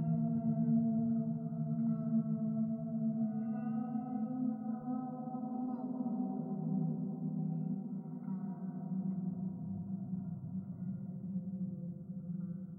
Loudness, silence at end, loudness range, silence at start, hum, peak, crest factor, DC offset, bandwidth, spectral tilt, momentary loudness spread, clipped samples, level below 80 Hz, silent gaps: -38 LUFS; 0 s; 6 LU; 0 s; none; -24 dBFS; 14 dB; under 0.1%; 1.6 kHz; -14 dB/octave; 8 LU; under 0.1%; -76 dBFS; none